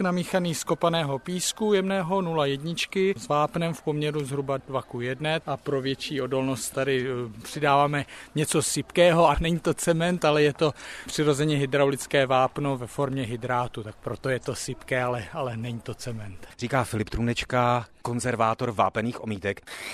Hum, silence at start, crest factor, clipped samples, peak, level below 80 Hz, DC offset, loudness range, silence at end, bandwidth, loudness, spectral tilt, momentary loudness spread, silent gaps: none; 0 s; 20 dB; under 0.1%; -6 dBFS; -48 dBFS; under 0.1%; 7 LU; 0 s; 15 kHz; -26 LUFS; -5 dB/octave; 11 LU; none